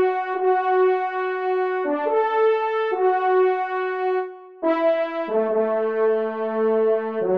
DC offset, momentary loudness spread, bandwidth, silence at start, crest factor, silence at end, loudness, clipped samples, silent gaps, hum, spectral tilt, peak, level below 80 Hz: 0.1%; 5 LU; 5.2 kHz; 0 s; 12 dB; 0 s; -22 LUFS; under 0.1%; none; none; -7.5 dB/octave; -10 dBFS; -76 dBFS